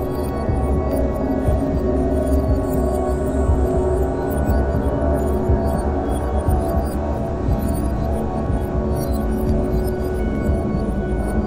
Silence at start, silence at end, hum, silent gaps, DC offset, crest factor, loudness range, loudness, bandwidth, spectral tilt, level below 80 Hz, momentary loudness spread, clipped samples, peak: 0 s; 0 s; none; none; under 0.1%; 14 dB; 2 LU; -21 LUFS; 16 kHz; -8.5 dB/octave; -22 dBFS; 3 LU; under 0.1%; -6 dBFS